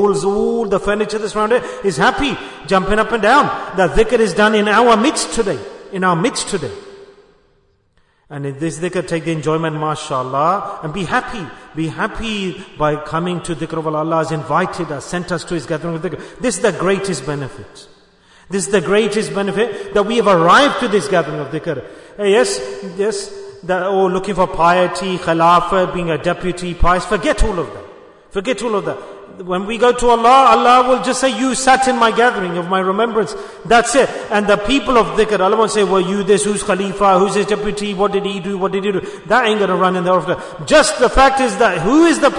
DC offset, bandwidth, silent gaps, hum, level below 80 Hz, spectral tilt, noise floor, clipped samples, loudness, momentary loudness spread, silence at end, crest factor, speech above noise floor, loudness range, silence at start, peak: under 0.1%; 11 kHz; none; none; -34 dBFS; -4.5 dB/octave; -57 dBFS; under 0.1%; -15 LUFS; 12 LU; 0 s; 16 dB; 42 dB; 7 LU; 0 s; 0 dBFS